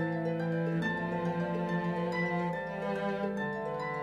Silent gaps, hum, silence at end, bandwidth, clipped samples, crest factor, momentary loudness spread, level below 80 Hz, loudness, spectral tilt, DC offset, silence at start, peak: none; none; 0 s; 7.6 kHz; under 0.1%; 12 dB; 3 LU; -62 dBFS; -33 LUFS; -8 dB/octave; under 0.1%; 0 s; -20 dBFS